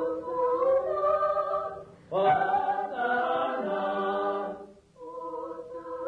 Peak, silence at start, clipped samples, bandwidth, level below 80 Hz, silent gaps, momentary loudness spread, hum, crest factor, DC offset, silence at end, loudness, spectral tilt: -16 dBFS; 0 s; under 0.1%; 6.6 kHz; -64 dBFS; none; 15 LU; none; 14 dB; under 0.1%; 0 s; -28 LUFS; -6.5 dB/octave